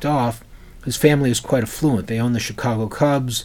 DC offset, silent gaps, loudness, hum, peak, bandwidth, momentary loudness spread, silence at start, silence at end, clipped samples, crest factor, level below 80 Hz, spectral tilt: under 0.1%; none; -20 LUFS; none; 0 dBFS; 18 kHz; 9 LU; 0 s; 0 s; under 0.1%; 18 dB; -42 dBFS; -5.5 dB/octave